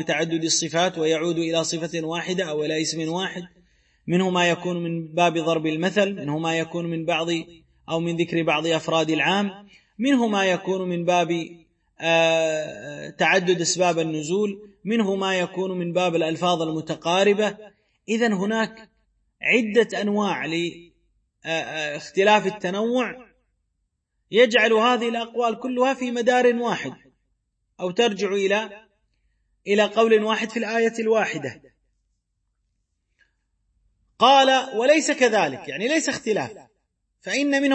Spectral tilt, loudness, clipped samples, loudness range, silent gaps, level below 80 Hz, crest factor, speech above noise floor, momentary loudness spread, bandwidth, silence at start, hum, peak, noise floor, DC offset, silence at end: -4 dB/octave; -22 LUFS; under 0.1%; 4 LU; none; -68 dBFS; 20 dB; 53 dB; 10 LU; 8.8 kHz; 0 s; none; -4 dBFS; -75 dBFS; under 0.1%; 0 s